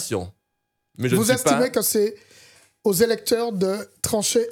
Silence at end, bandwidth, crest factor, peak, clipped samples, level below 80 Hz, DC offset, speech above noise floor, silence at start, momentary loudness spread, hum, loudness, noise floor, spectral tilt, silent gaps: 0 s; over 20 kHz; 18 dB; -6 dBFS; under 0.1%; -60 dBFS; under 0.1%; 55 dB; 0 s; 9 LU; none; -21 LUFS; -77 dBFS; -4 dB/octave; none